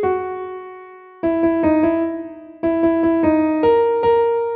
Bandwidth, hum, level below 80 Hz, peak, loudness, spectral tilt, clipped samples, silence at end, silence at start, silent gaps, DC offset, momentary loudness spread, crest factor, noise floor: 4.6 kHz; none; -48 dBFS; -6 dBFS; -17 LUFS; -10 dB/octave; under 0.1%; 0 s; 0 s; none; under 0.1%; 15 LU; 12 dB; -39 dBFS